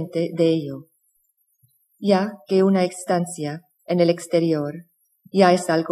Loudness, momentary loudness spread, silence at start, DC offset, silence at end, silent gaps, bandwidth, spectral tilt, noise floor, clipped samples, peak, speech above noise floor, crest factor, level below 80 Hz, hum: -21 LUFS; 14 LU; 0 s; under 0.1%; 0 s; none; 14 kHz; -6 dB/octave; -68 dBFS; under 0.1%; -2 dBFS; 48 dB; 18 dB; -76 dBFS; none